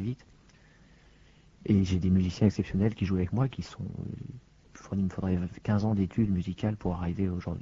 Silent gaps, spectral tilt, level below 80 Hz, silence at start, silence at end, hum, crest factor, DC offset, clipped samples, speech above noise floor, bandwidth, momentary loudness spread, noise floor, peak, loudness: none; -8.5 dB/octave; -50 dBFS; 0 s; 0 s; none; 20 dB; under 0.1%; under 0.1%; 29 dB; 7.6 kHz; 13 LU; -58 dBFS; -10 dBFS; -30 LUFS